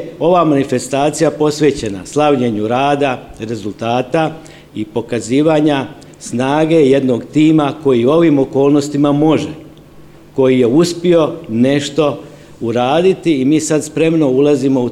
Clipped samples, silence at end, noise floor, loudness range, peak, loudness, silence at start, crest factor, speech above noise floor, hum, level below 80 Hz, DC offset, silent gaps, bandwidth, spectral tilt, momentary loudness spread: under 0.1%; 0 s; -38 dBFS; 4 LU; 0 dBFS; -13 LUFS; 0 s; 12 dB; 26 dB; none; -48 dBFS; 0.2%; none; 12.5 kHz; -6 dB/octave; 12 LU